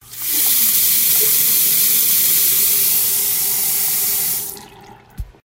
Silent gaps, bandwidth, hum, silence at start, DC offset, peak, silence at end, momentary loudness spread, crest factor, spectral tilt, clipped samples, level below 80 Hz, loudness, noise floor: none; 16.5 kHz; none; 0.1 s; under 0.1%; -2 dBFS; 0.15 s; 5 LU; 14 dB; 1 dB/octave; under 0.1%; -44 dBFS; -12 LUFS; -42 dBFS